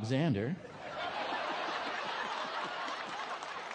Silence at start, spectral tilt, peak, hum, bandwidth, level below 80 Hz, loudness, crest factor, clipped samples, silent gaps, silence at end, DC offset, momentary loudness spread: 0 s; -5.5 dB/octave; -20 dBFS; none; 10 kHz; -74 dBFS; -37 LUFS; 16 dB; under 0.1%; none; 0 s; under 0.1%; 8 LU